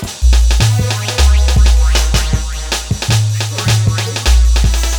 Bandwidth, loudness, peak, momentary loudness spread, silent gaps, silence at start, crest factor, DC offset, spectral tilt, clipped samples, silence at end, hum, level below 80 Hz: 18 kHz; -13 LUFS; 0 dBFS; 6 LU; none; 0 s; 10 dB; under 0.1%; -4 dB/octave; under 0.1%; 0 s; none; -12 dBFS